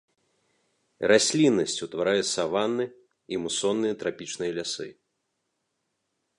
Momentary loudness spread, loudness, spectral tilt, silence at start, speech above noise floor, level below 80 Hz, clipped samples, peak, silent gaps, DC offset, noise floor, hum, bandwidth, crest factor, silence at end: 12 LU; -26 LUFS; -3.5 dB/octave; 1 s; 53 dB; -68 dBFS; under 0.1%; -6 dBFS; none; under 0.1%; -78 dBFS; none; 11.5 kHz; 22 dB; 1.45 s